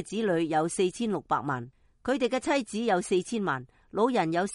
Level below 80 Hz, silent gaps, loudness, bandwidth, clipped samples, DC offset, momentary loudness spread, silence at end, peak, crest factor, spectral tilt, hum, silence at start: -62 dBFS; none; -29 LUFS; 11.5 kHz; under 0.1%; under 0.1%; 9 LU; 0 s; -12 dBFS; 16 dB; -5 dB/octave; none; 0 s